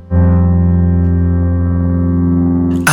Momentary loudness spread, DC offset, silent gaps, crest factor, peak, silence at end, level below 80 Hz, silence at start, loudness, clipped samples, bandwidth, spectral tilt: 3 LU; under 0.1%; none; 12 dB; 0 dBFS; 0 s; -22 dBFS; 0 s; -13 LUFS; under 0.1%; 2.1 kHz; -7 dB/octave